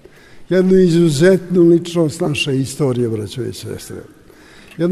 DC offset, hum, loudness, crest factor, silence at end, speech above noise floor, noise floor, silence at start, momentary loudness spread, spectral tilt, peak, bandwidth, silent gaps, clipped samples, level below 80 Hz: under 0.1%; none; -15 LUFS; 14 dB; 0 s; 28 dB; -43 dBFS; 0.35 s; 17 LU; -6.5 dB/octave; -2 dBFS; 13.5 kHz; none; under 0.1%; -46 dBFS